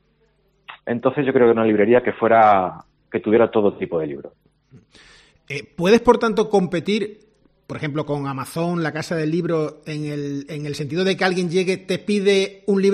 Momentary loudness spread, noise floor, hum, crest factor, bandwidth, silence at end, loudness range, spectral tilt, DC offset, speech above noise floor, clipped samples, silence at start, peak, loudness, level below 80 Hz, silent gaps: 13 LU; -62 dBFS; none; 20 dB; 13 kHz; 0 s; 7 LU; -6 dB/octave; under 0.1%; 43 dB; under 0.1%; 0.7 s; 0 dBFS; -20 LUFS; -54 dBFS; none